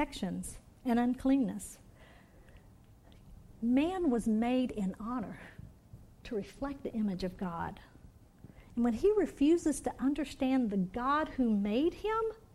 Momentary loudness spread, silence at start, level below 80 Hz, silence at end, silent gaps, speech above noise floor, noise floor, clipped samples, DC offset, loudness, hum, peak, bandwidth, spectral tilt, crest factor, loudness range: 14 LU; 0 s; -54 dBFS; 0.15 s; none; 26 dB; -58 dBFS; under 0.1%; under 0.1%; -33 LUFS; none; -18 dBFS; 13.5 kHz; -6 dB/octave; 14 dB; 8 LU